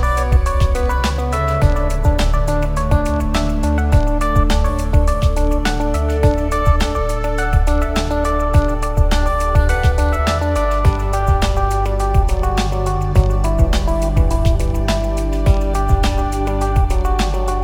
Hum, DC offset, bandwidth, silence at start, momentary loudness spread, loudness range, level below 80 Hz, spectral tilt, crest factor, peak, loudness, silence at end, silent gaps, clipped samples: none; under 0.1%; 16 kHz; 0 s; 3 LU; 1 LU; -16 dBFS; -6 dB/octave; 14 dB; 0 dBFS; -17 LUFS; 0 s; none; under 0.1%